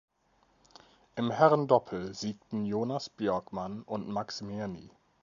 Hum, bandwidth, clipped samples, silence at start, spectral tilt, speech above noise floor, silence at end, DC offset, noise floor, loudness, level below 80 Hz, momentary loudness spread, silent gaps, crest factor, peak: none; 7.4 kHz; under 0.1%; 1.15 s; -6.5 dB/octave; 39 dB; 0.35 s; under 0.1%; -69 dBFS; -31 LUFS; -66 dBFS; 14 LU; none; 24 dB; -8 dBFS